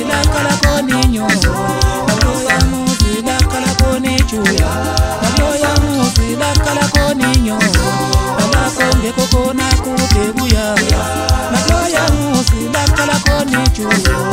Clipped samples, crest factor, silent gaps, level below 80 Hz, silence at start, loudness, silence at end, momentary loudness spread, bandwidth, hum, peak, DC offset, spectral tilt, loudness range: under 0.1%; 12 dB; none; -18 dBFS; 0 s; -13 LUFS; 0 s; 2 LU; 16.5 kHz; none; 0 dBFS; under 0.1%; -4.5 dB/octave; 1 LU